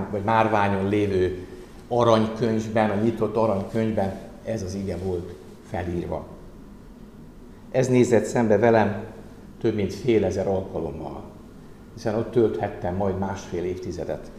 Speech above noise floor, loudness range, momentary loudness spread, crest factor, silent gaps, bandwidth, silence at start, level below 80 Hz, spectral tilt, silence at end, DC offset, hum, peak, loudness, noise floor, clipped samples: 21 dB; 8 LU; 17 LU; 20 dB; none; 13.5 kHz; 0 s; -48 dBFS; -7 dB/octave; 0 s; 0.1%; none; -4 dBFS; -24 LUFS; -44 dBFS; under 0.1%